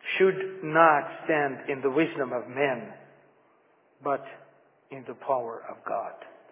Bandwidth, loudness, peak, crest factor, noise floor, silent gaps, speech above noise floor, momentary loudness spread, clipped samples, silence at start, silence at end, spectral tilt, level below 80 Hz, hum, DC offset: 3.8 kHz; -27 LUFS; -4 dBFS; 24 dB; -64 dBFS; none; 37 dB; 21 LU; under 0.1%; 0.05 s; 0.2 s; -9 dB/octave; -84 dBFS; none; under 0.1%